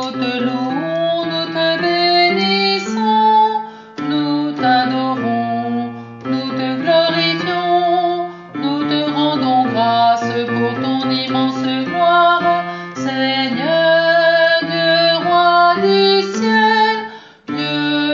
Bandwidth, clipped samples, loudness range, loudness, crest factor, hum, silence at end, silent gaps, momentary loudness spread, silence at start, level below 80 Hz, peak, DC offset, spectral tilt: 7.4 kHz; under 0.1%; 4 LU; -15 LUFS; 14 dB; none; 0 s; none; 10 LU; 0 s; -66 dBFS; -2 dBFS; under 0.1%; -2 dB/octave